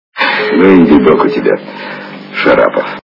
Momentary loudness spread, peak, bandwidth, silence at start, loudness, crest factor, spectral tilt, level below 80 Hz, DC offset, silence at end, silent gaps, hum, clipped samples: 18 LU; 0 dBFS; 6 kHz; 0.15 s; -9 LUFS; 10 dB; -8 dB/octave; -42 dBFS; under 0.1%; 0.05 s; none; none; 0.9%